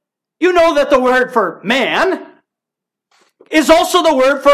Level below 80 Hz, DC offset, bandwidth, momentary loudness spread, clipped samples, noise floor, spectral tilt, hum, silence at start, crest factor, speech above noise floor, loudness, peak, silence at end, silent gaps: -46 dBFS; under 0.1%; 15.5 kHz; 7 LU; under 0.1%; -83 dBFS; -3 dB/octave; none; 0.4 s; 14 dB; 71 dB; -12 LUFS; 0 dBFS; 0 s; none